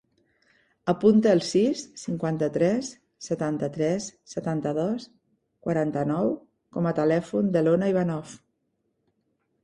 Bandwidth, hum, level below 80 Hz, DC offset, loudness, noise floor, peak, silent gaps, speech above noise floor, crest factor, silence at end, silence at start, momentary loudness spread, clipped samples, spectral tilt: 11 kHz; none; -64 dBFS; under 0.1%; -25 LUFS; -75 dBFS; -8 dBFS; none; 51 dB; 18 dB; 1.3 s; 0.85 s; 13 LU; under 0.1%; -6.5 dB/octave